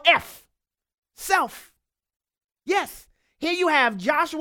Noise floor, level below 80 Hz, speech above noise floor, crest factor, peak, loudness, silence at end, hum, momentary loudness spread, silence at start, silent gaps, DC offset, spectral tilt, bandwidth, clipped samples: -80 dBFS; -62 dBFS; 57 dB; 24 dB; -2 dBFS; -22 LUFS; 0 s; none; 19 LU; 0.05 s; 0.94-1.03 s, 2.16-2.20 s; under 0.1%; -2.5 dB/octave; 19 kHz; under 0.1%